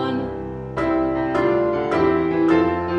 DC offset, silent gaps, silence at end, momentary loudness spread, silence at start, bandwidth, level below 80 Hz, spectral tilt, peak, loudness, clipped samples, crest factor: under 0.1%; none; 0 s; 10 LU; 0 s; 6.6 kHz; -42 dBFS; -8 dB/octave; -4 dBFS; -20 LUFS; under 0.1%; 16 dB